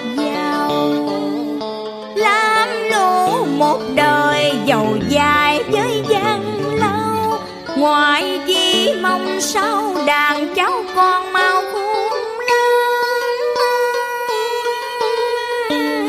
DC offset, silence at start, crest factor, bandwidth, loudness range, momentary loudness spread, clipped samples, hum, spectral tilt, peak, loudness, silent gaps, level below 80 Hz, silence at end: under 0.1%; 0 s; 14 dB; 15.5 kHz; 2 LU; 7 LU; under 0.1%; none; -3.5 dB/octave; -2 dBFS; -16 LUFS; none; -52 dBFS; 0 s